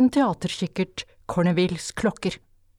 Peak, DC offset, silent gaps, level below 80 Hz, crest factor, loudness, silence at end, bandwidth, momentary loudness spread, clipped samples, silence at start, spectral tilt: -10 dBFS; under 0.1%; none; -52 dBFS; 16 dB; -25 LUFS; 0.4 s; 14 kHz; 9 LU; under 0.1%; 0 s; -6 dB/octave